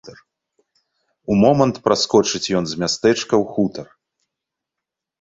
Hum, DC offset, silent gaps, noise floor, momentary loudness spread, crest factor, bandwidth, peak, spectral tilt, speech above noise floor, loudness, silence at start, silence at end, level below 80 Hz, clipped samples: none; under 0.1%; none; -84 dBFS; 8 LU; 20 dB; 8 kHz; 0 dBFS; -5 dB/octave; 67 dB; -18 LUFS; 0.05 s; 1.4 s; -54 dBFS; under 0.1%